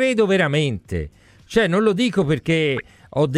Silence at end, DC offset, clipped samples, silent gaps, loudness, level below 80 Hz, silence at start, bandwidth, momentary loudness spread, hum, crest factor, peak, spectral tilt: 0 s; under 0.1%; under 0.1%; none; -20 LUFS; -44 dBFS; 0 s; 12.5 kHz; 11 LU; none; 16 dB; -4 dBFS; -6 dB/octave